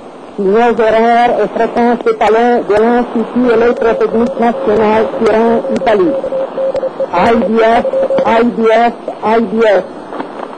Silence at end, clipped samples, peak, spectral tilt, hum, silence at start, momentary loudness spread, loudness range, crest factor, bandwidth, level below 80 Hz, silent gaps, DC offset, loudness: 0 s; under 0.1%; -2 dBFS; -6.5 dB/octave; none; 0 s; 6 LU; 1 LU; 8 dB; 9.2 kHz; -42 dBFS; none; 0.4%; -11 LUFS